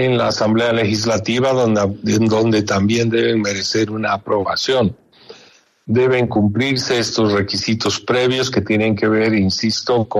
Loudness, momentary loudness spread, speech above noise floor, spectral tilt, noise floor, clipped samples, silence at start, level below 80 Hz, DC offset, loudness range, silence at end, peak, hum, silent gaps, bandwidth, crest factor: -17 LUFS; 3 LU; 33 dB; -5 dB/octave; -49 dBFS; under 0.1%; 0 s; -52 dBFS; under 0.1%; 2 LU; 0 s; -4 dBFS; none; none; 13 kHz; 12 dB